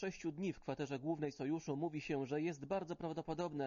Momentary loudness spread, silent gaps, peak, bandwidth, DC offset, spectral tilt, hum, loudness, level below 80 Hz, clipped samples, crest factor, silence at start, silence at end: 3 LU; none; -26 dBFS; 7.2 kHz; under 0.1%; -6.5 dB/octave; none; -42 LUFS; -70 dBFS; under 0.1%; 14 dB; 0 s; 0 s